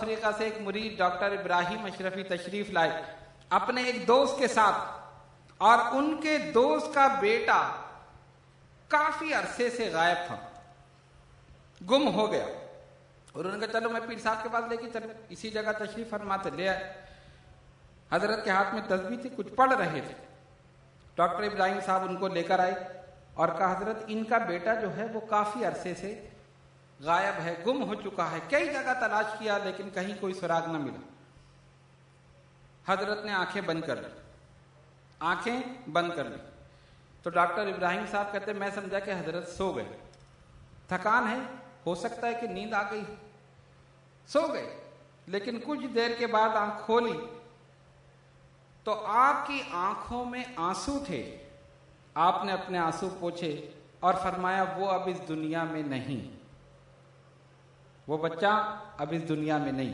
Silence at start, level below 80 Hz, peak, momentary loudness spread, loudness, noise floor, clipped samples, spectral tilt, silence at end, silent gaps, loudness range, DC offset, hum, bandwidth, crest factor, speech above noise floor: 0 s; -64 dBFS; -8 dBFS; 14 LU; -30 LUFS; -59 dBFS; under 0.1%; -5 dB/octave; 0 s; none; 8 LU; under 0.1%; none; 11 kHz; 24 dB; 29 dB